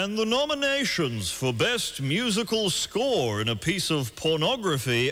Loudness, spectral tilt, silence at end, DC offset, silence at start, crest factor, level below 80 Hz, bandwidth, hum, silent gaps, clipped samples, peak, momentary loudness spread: -25 LUFS; -4 dB/octave; 0 s; under 0.1%; 0 s; 12 dB; -54 dBFS; 17.5 kHz; none; none; under 0.1%; -14 dBFS; 3 LU